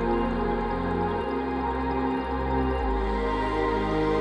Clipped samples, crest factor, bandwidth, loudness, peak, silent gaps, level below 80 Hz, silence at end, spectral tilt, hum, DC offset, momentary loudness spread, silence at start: under 0.1%; 12 dB; 8.8 kHz; -27 LUFS; -12 dBFS; none; -34 dBFS; 0 s; -8 dB/octave; none; under 0.1%; 2 LU; 0 s